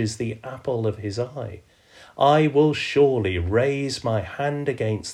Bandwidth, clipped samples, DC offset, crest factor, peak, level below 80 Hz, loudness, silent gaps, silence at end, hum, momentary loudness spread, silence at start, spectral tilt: 11.5 kHz; under 0.1%; under 0.1%; 18 dB; -6 dBFS; -48 dBFS; -23 LUFS; none; 0 s; none; 12 LU; 0 s; -6 dB/octave